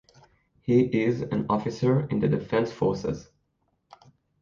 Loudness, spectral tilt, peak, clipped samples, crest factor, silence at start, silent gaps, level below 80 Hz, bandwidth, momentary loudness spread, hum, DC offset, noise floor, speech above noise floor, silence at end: -26 LUFS; -8 dB/octave; -8 dBFS; under 0.1%; 18 dB; 0.65 s; none; -56 dBFS; 7.2 kHz; 9 LU; none; under 0.1%; -73 dBFS; 49 dB; 1.2 s